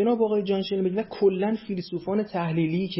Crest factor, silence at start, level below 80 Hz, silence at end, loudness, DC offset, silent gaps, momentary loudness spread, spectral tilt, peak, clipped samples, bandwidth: 14 dB; 0 s; -62 dBFS; 0 s; -26 LUFS; under 0.1%; none; 6 LU; -11.5 dB/octave; -12 dBFS; under 0.1%; 5.8 kHz